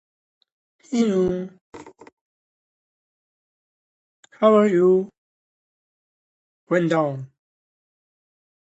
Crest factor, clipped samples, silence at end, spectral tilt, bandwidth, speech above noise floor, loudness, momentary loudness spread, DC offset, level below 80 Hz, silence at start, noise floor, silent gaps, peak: 22 dB; under 0.1%; 1.35 s; -7 dB/octave; 8.2 kHz; over 71 dB; -20 LUFS; 16 LU; under 0.1%; -62 dBFS; 0.9 s; under -90 dBFS; 1.61-1.72 s, 2.12-4.23 s, 5.18-6.67 s; -4 dBFS